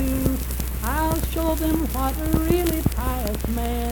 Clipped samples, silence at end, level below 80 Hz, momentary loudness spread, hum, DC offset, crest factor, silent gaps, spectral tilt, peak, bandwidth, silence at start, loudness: under 0.1%; 0 s; -26 dBFS; 5 LU; none; under 0.1%; 18 dB; none; -6 dB/octave; -4 dBFS; 19 kHz; 0 s; -24 LUFS